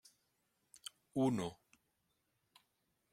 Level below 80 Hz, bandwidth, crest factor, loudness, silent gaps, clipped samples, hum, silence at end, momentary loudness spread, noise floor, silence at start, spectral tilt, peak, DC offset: -78 dBFS; 15.5 kHz; 20 dB; -39 LUFS; none; under 0.1%; none; 1.6 s; 17 LU; -83 dBFS; 1.15 s; -6 dB/octave; -24 dBFS; under 0.1%